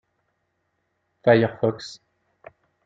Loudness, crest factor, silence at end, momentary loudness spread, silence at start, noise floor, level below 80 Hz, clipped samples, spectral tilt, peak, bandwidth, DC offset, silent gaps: -21 LUFS; 24 dB; 0.9 s; 19 LU; 1.25 s; -74 dBFS; -68 dBFS; under 0.1%; -7 dB/octave; -2 dBFS; 7.8 kHz; under 0.1%; none